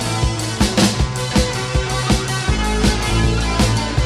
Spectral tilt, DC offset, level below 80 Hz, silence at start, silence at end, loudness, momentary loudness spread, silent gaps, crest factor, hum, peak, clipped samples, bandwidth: -4.5 dB/octave; under 0.1%; -22 dBFS; 0 s; 0 s; -18 LUFS; 4 LU; none; 14 dB; none; -2 dBFS; under 0.1%; 15 kHz